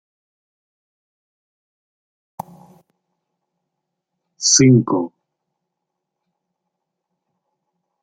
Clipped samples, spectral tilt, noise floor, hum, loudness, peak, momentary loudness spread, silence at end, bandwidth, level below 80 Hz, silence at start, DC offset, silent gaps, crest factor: under 0.1%; -4 dB/octave; -80 dBFS; none; -14 LUFS; -2 dBFS; 25 LU; 2.95 s; 9.4 kHz; -60 dBFS; 4.4 s; under 0.1%; none; 22 dB